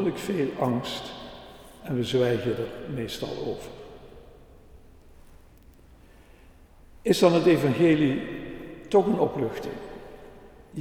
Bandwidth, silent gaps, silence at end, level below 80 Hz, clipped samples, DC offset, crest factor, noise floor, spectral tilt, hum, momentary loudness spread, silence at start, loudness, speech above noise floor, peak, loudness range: 17 kHz; none; 0 s; -52 dBFS; under 0.1%; under 0.1%; 22 dB; -52 dBFS; -6 dB/octave; none; 22 LU; 0 s; -25 LUFS; 28 dB; -6 dBFS; 14 LU